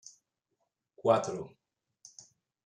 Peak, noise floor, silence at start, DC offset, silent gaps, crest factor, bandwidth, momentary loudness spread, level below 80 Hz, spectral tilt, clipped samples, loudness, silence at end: -10 dBFS; -82 dBFS; 1.05 s; under 0.1%; none; 26 dB; 10 kHz; 25 LU; -78 dBFS; -5 dB/octave; under 0.1%; -31 LUFS; 1.15 s